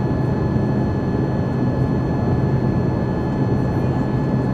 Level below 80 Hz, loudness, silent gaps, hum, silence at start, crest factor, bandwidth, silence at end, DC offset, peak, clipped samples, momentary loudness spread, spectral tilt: -34 dBFS; -20 LUFS; none; none; 0 s; 12 dB; 6.4 kHz; 0 s; under 0.1%; -6 dBFS; under 0.1%; 2 LU; -9.5 dB/octave